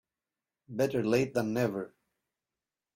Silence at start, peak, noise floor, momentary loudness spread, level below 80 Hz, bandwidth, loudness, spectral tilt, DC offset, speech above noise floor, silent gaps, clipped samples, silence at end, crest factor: 0.7 s; -14 dBFS; under -90 dBFS; 13 LU; -68 dBFS; 16 kHz; -31 LUFS; -6.5 dB/octave; under 0.1%; over 60 dB; none; under 0.1%; 1.1 s; 18 dB